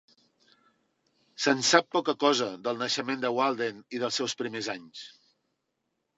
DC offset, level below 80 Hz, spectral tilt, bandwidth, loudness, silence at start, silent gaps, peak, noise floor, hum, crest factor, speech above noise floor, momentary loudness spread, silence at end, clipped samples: under 0.1%; -82 dBFS; -2.5 dB/octave; 8.2 kHz; -27 LUFS; 1.4 s; none; -4 dBFS; -80 dBFS; none; 26 dB; 52 dB; 13 LU; 1.05 s; under 0.1%